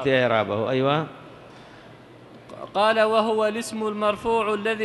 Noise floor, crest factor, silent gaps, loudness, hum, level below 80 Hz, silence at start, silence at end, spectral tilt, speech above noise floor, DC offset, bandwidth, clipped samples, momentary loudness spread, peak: -46 dBFS; 16 dB; none; -23 LUFS; none; -60 dBFS; 0 s; 0 s; -5 dB/octave; 24 dB; under 0.1%; 12.5 kHz; under 0.1%; 14 LU; -6 dBFS